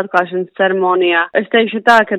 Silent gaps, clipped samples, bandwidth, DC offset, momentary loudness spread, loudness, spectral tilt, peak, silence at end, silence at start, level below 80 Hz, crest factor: none; 0.2%; 12.5 kHz; under 0.1%; 5 LU; -14 LUFS; -5 dB/octave; 0 dBFS; 0 s; 0 s; -56 dBFS; 14 dB